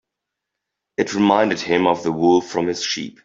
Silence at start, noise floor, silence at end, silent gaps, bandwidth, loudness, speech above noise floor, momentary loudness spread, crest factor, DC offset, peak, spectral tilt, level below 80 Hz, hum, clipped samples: 1 s; -82 dBFS; 0.15 s; none; 7.8 kHz; -19 LUFS; 64 dB; 7 LU; 18 dB; under 0.1%; -2 dBFS; -4.5 dB/octave; -60 dBFS; none; under 0.1%